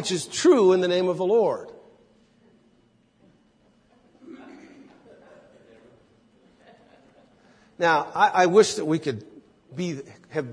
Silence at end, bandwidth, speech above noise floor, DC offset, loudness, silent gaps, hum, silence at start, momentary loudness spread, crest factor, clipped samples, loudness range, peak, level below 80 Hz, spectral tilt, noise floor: 0 s; 10.5 kHz; 41 dB; under 0.1%; -22 LUFS; none; none; 0 s; 22 LU; 22 dB; under 0.1%; 7 LU; -4 dBFS; -72 dBFS; -4.5 dB/octave; -62 dBFS